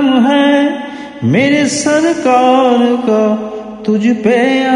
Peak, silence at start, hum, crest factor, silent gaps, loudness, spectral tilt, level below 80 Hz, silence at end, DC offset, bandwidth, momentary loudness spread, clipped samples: 0 dBFS; 0 s; none; 10 dB; none; -11 LUFS; -5 dB/octave; -54 dBFS; 0 s; under 0.1%; 11 kHz; 10 LU; under 0.1%